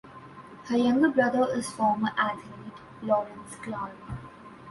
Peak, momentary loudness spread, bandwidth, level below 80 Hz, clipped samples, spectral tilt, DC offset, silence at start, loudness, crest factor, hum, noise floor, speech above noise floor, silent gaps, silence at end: -10 dBFS; 23 LU; 11.5 kHz; -58 dBFS; under 0.1%; -5.5 dB/octave; under 0.1%; 0.05 s; -27 LUFS; 18 dB; none; -46 dBFS; 20 dB; none; 0 s